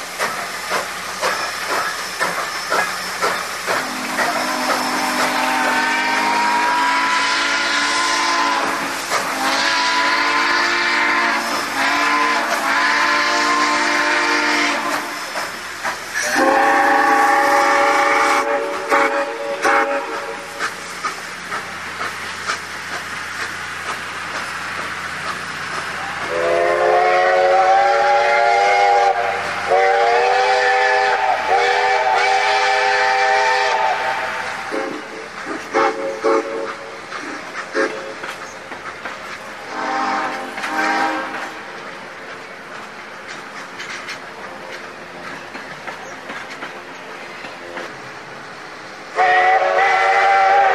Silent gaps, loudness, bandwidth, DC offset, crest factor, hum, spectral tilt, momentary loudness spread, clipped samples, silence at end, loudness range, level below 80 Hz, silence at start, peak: none; -17 LUFS; 13.5 kHz; 0.2%; 16 dB; none; -1.5 dB/octave; 17 LU; under 0.1%; 0 s; 15 LU; -60 dBFS; 0 s; -2 dBFS